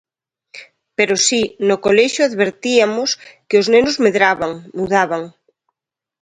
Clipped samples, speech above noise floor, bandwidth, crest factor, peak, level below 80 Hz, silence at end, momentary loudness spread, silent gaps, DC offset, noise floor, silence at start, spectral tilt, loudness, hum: under 0.1%; 70 dB; 10.5 kHz; 16 dB; 0 dBFS; -54 dBFS; 0.9 s; 11 LU; none; under 0.1%; -85 dBFS; 0.55 s; -3 dB/octave; -15 LUFS; none